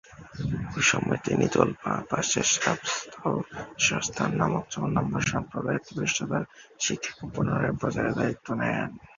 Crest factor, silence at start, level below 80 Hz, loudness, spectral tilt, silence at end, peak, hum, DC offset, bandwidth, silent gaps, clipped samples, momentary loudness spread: 24 dB; 0.1 s; -52 dBFS; -27 LUFS; -4 dB/octave; 0.1 s; -2 dBFS; none; under 0.1%; 7.6 kHz; none; under 0.1%; 9 LU